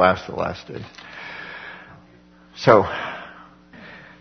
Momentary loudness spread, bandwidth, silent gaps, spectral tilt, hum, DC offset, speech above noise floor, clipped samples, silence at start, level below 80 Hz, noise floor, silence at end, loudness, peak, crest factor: 26 LU; 6.6 kHz; none; -6 dB/octave; none; under 0.1%; 31 dB; under 0.1%; 0 s; -54 dBFS; -50 dBFS; 0.25 s; -21 LUFS; 0 dBFS; 24 dB